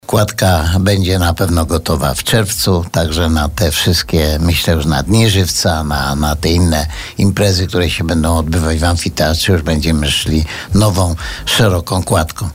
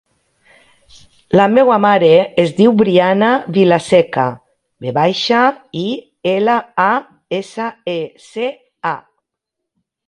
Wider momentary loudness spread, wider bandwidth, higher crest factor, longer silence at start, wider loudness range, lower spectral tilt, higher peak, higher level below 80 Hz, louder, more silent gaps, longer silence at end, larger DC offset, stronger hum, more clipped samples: second, 4 LU vs 13 LU; first, 16.5 kHz vs 11 kHz; about the same, 12 dB vs 14 dB; second, 0.1 s vs 1.3 s; second, 1 LU vs 7 LU; second, -5 dB/octave vs -6.5 dB/octave; about the same, -2 dBFS vs 0 dBFS; first, -24 dBFS vs -56 dBFS; about the same, -13 LUFS vs -14 LUFS; neither; second, 0 s vs 1.1 s; neither; neither; neither